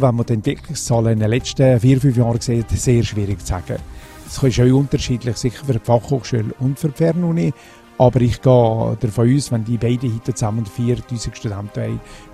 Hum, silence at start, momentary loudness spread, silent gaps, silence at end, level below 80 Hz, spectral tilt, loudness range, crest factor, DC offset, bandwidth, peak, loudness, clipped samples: none; 0 s; 12 LU; none; 0 s; -36 dBFS; -7 dB/octave; 3 LU; 16 dB; under 0.1%; 13.5 kHz; 0 dBFS; -18 LUFS; under 0.1%